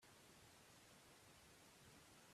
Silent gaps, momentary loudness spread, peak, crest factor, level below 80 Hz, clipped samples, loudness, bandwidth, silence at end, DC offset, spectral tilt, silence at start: none; 1 LU; -54 dBFS; 14 dB; -84 dBFS; under 0.1%; -66 LUFS; 15 kHz; 0 s; under 0.1%; -2.5 dB/octave; 0 s